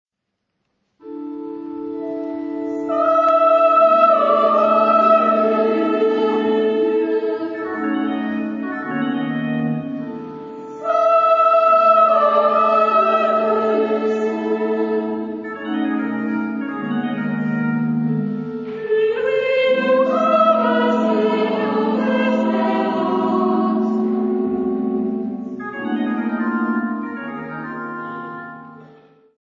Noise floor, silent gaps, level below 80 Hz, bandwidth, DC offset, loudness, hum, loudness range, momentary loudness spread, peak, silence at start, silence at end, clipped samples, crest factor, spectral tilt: -77 dBFS; none; -66 dBFS; 7.4 kHz; under 0.1%; -18 LUFS; none; 9 LU; 15 LU; -2 dBFS; 1.05 s; 0.55 s; under 0.1%; 16 dB; -8 dB/octave